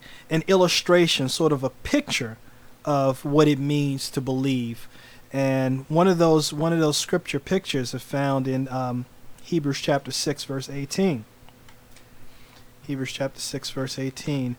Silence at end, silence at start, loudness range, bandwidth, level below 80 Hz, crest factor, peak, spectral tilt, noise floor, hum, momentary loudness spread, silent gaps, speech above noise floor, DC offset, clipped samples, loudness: 0.05 s; 0 s; 8 LU; over 20 kHz; -52 dBFS; 20 dB; -6 dBFS; -5 dB/octave; -48 dBFS; none; 12 LU; none; 24 dB; under 0.1%; under 0.1%; -24 LUFS